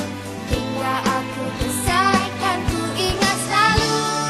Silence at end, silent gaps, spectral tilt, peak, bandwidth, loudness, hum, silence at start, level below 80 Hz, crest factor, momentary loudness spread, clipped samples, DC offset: 0 s; none; -3.5 dB/octave; -2 dBFS; 13 kHz; -20 LUFS; none; 0 s; -34 dBFS; 18 dB; 9 LU; under 0.1%; under 0.1%